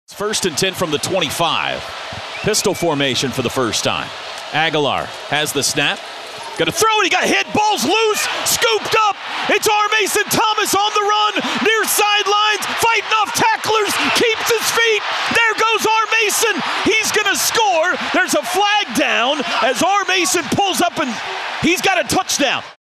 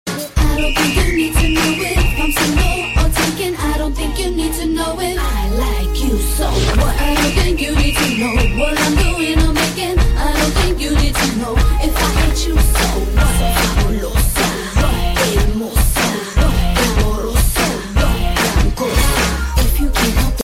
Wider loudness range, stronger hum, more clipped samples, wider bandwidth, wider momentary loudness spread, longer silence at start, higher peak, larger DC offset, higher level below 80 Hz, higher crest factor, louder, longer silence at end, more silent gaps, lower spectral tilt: about the same, 4 LU vs 2 LU; neither; neither; about the same, 15 kHz vs 16.5 kHz; about the same, 6 LU vs 4 LU; about the same, 0.1 s vs 0.05 s; about the same, -2 dBFS vs 0 dBFS; neither; second, -54 dBFS vs -16 dBFS; about the same, 14 dB vs 14 dB; about the same, -15 LUFS vs -16 LUFS; first, 0.15 s vs 0 s; neither; second, -2 dB/octave vs -4.5 dB/octave